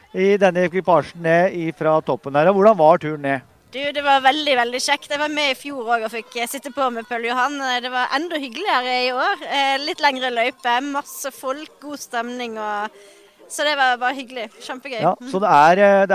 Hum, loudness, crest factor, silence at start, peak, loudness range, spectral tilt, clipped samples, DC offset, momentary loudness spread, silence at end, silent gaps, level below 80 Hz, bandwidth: none; -19 LUFS; 18 dB; 0.15 s; -2 dBFS; 6 LU; -4 dB/octave; under 0.1%; under 0.1%; 14 LU; 0 s; none; -66 dBFS; 16 kHz